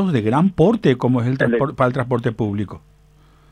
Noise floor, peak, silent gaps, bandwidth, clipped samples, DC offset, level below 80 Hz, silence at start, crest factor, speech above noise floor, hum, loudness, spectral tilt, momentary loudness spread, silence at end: -51 dBFS; -2 dBFS; none; 9.8 kHz; under 0.1%; under 0.1%; -48 dBFS; 0 s; 16 dB; 33 dB; none; -18 LUFS; -8.5 dB/octave; 8 LU; 0.75 s